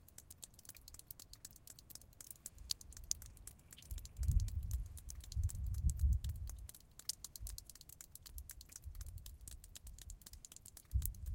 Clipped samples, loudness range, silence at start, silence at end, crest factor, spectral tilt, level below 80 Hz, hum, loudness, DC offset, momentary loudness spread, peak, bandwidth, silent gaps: under 0.1%; 10 LU; 0 s; 0 s; 28 dB; -3.5 dB/octave; -46 dBFS; none; -46 LUFS; under 0.1%; 16 LU; -16 dBFS; 17 kHz; none